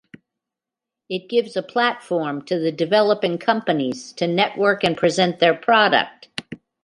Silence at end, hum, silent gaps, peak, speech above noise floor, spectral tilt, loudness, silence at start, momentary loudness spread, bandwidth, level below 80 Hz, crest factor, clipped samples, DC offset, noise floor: 0.3 s; none; none; -2 dBFS; 67 dB; -5 dB/octave; -20 LUFS; 1.1 s; 13 LU; 11.5 kHz; -64 dBFS; 18 dB; under 0.1%; under 0.1%; -86 dBFS